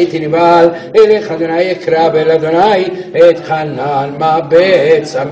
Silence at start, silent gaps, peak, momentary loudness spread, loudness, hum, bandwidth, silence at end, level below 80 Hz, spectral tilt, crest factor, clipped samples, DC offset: 0 s; none; 0 dBFS; 7 LU; -10 LUFS; none; 8 kHz; 0 s; -52 dBFS; -6.5 dB/octave; 10 dB; 1%; under 0.1%